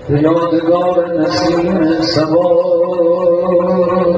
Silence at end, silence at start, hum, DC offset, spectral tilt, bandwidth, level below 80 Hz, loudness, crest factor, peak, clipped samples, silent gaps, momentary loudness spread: 0 s; 0 s; none; under 0.1%; -7 dB/octave; 8 kHz; -42 dBFS; -13 LUFS; 12 dB; 0 dBFS; under 0.1%; none; 2 LU